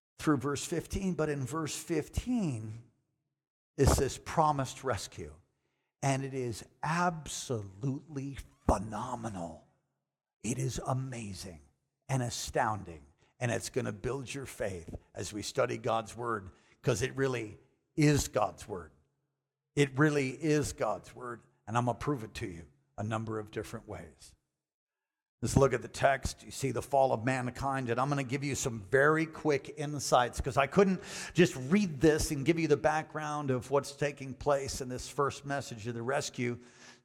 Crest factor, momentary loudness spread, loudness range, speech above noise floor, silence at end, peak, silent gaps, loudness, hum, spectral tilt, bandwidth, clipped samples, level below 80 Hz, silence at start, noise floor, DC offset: 24 dB; 14 LU; 8 LU; 55 dB; 0.1 s; -10 dBFS; 3.47-3.74 s, 10.36-10.40 s, 24.74-24.87 s, 25.29-25.38 s; -33 LUFS; none; -5.5 dB/octave; 16.5 kHz; under 0.1%; -50 dBFS; 0.2 s; -87 dBFS; under 0.1%